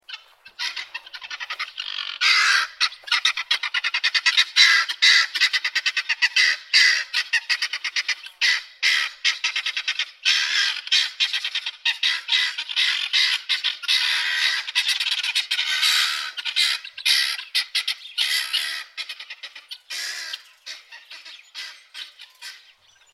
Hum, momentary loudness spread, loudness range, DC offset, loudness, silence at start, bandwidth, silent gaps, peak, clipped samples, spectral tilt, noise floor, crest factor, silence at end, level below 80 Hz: none; 20 LU; 10 LU; under 0.1%; -20 LUFS; 0.1 s; 16 kHz; none; -2 dBFS; under 0.1%; 6 dB/octave; -55 dBFS; 22 dB; 0.55 s; -82 dBFS